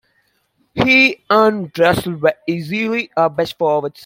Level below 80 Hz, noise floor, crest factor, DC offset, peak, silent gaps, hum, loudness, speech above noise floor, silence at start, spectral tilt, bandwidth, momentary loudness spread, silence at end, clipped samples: -50 dBFS; -63 dBFS; 16 dB; under 0.1%; 0 dBFS; none; none; -15 LUFS; 47 dB; 0.75 s; -5.5 dB/octave; 16.5 kHz; 9 LU; 0 s; under 0.1%